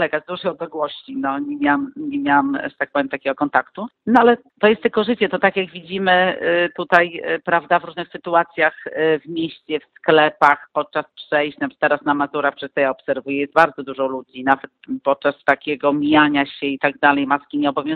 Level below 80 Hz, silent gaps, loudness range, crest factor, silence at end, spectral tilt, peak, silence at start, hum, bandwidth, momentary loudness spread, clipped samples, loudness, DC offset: -60 dBFS; none; 3 LU; 18 dB; 0 s; -7 dB/octave; 0 dBFS; 0 s; none; 6.2 kHz; 10 LU; under 0.1%; -19 LUFS; under 0.1%